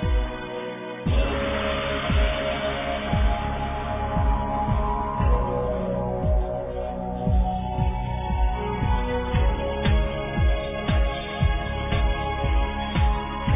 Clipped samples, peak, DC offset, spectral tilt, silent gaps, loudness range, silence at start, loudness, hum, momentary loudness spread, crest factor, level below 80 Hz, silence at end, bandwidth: under 0.1%; -10 dBFS; under 0.1%; -10.5 dB/octave; none; 1 LU; 0 s; -26 LUFS; none; 5 LU; 14 dB; -26 dBFS; 0 s; 3.8 kHz